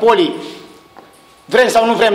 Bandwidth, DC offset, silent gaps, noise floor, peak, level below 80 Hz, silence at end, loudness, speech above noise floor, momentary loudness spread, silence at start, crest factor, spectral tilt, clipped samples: 16 kHz; under 0.1%; none; -44 dBFS; -2 dBFS; -54 dBFS; 0 s; -13 LUFS; 32 dB; 20 LU; 0 s; 14 dB; -3.5 dB/octave; under 0.1%